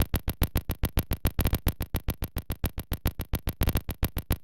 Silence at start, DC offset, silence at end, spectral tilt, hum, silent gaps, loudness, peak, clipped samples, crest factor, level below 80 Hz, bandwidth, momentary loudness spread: 0 s; under 0.1%; 0 s; -5.5 dB/octave; none; none; -31 LUFS; -10 dBFS; under 0.1%; 18 dB; -32 dBFS; 17 kHz; 5 LU